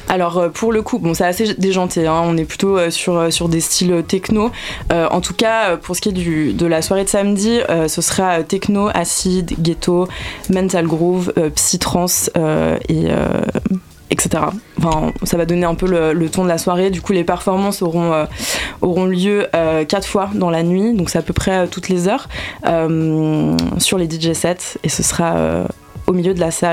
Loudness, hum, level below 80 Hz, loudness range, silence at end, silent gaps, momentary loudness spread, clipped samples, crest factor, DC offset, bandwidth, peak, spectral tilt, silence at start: -16 LUFS; none; -36 dBFS; 1 LU; 0 s; none; 4 LU; under 0.1%; 16 dB; under 0.1%; 16.5 kHz; 0 dBFS; -4.5 dB/octave; 0 s